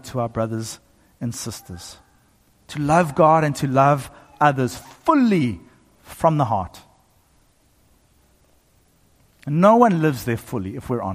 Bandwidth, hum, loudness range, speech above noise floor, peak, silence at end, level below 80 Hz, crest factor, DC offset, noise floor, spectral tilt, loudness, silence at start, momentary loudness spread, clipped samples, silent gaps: 15.5 kHz; none; 8 LU; 39 dB; -4 dBFS; 0 s; -52 dBFS; 18 dB; under 0.1%; -59 dBFS; -6.5 dB/octave; -20 LUFS; 0.05 s; 20 LU; under 0.1%; none